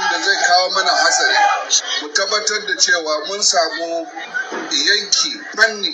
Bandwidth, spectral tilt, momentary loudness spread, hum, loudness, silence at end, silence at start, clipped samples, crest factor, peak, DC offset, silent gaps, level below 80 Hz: 11.5 kHz; 1.5 dB/octave; 10 LU; none; -15 LUFS; 0 s; 0 s; under 0.1%; 18 dB; 0 dBFS; under 0.1%; none; -80 dBFS